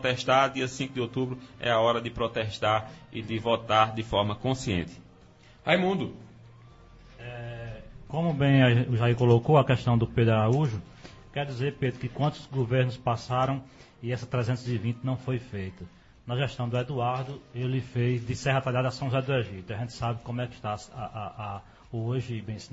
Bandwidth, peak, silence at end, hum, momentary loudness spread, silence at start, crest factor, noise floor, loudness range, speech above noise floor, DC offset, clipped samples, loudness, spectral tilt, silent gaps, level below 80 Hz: 8 kHz; -8 dBFS; 0.05 s; none; 16 LU; 0 s; 20 dB; -54 dBFS; 8 LU; 27 dB; under 0.1%; under 0.1%; -28 LUFS; -6.5 dB/octave; none; -54 dBFS